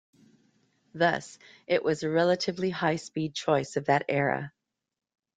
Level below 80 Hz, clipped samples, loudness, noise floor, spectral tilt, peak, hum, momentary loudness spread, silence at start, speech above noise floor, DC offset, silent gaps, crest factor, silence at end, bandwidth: -70 dBFS; under 0.1%; -28 LUFS; -68 dBFS; -5.5 dB/octave; -10 dBFS; none; 11 LU; 0.95 s; 41 dB; under 0.1%; none; 20 dB; 0.85 s; 9.4 kHz